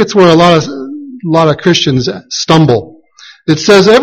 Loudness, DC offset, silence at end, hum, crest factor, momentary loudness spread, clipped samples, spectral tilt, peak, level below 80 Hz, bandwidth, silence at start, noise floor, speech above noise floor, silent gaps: -9 LUFS; under 0.1%; 0 s; none; 8 dB; 16 LU; 2%; -5.5 dB/octave; 0 dBFS; -42 dBFS; 11.5 kHz; 0 s; -38 dBFS; 31 dB; none